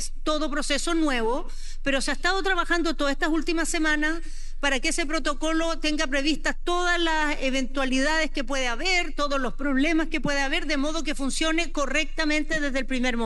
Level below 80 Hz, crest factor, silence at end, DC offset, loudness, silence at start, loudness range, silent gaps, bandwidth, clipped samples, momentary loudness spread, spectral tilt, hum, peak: -30 dBFS; 16 dB; 0 s; under 0.1%; -25 LUFS; 0 s; 1 LU; none; 11.5 kHz; under 0.1%; 4 LU; -2.5 dB/octave; none; -8 dBFS